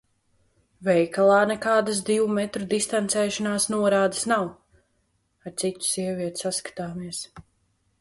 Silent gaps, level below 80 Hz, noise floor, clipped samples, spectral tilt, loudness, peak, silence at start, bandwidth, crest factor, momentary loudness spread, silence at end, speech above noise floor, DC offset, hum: none; -64 dBFS; -70 dBFS; under 0.1%; -3.5 dB/octave; -24 LUFS; -8 dBFS; 0.8 s; 12 kHz; 18 dB; 14 LU; 0.6 s; 46 dB; under 0.1%; none